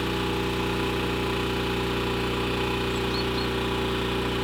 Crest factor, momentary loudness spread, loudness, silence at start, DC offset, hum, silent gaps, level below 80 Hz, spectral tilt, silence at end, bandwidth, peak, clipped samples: 12 dB; 0 LU; -26 LUFS; 0 s; under 0.1%; 60 Hz at -35 dBFS; none; -38 dBFS; -5 dB/octave; 0 s; 20 kHz; -14 dBFS; under 0.1%